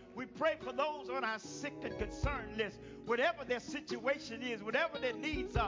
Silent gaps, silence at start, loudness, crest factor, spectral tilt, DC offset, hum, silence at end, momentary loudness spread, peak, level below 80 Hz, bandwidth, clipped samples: none; 0 s; -38 LUFS; 18 dB; -5 dB/octave; under 0.1%; none; 0 s; 8 LU; -20 dBFS; -50 dBFS; 7.6 kHz; under 0.1%